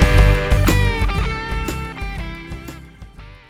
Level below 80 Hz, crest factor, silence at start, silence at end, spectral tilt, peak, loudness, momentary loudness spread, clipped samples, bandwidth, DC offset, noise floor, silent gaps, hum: -20 dBFS; 18 dB; 0 s; 0.15 s; -5.5 dB/octave; 0 dBFS; -19 LUFS; 19 LU; under 0.1%; 16 kHz; under 0.1%; -38 dBFS; none; none